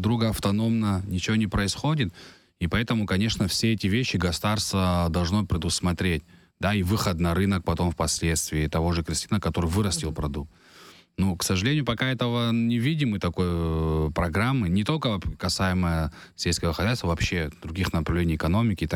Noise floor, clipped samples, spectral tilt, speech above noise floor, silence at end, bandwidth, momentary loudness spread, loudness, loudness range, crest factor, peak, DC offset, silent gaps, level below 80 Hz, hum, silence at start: -51 dBFS; under 0.1%; -5 dB/octave; 26 dB; 0 s; 17.5 kHz; 4 LU; -25 LUFS; 2 LU; 16 dB; -10 dBFS; under 0.1%; none; -38 dBFS; none; 0 s